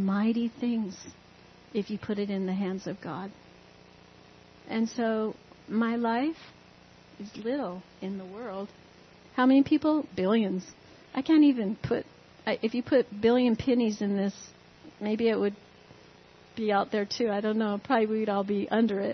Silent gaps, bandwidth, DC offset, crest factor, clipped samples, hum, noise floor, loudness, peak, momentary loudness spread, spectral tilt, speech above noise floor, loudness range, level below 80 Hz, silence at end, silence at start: none; 6.4 kHz; under 0.1%; 16 dB; under 0.1%; none; -55 dBFS; -28 LUFS; -12 dBFS; 16 LU; -6.5 dB/octave; 27 dB; 9 LU; -66 dBFS; 0 s; 0 s